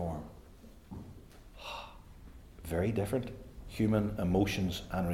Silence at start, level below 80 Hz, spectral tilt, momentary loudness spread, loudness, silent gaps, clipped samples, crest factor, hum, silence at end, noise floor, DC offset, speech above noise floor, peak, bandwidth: 0 s; -50 dBFS; -6.5 dB/octave; 24 LU; -34 LUFS; none; under 0.1%; 18 dB; none; 0 s; -54 dBFS; under 0.1%; 23 dB; -16 dBFS; 16.5 kHz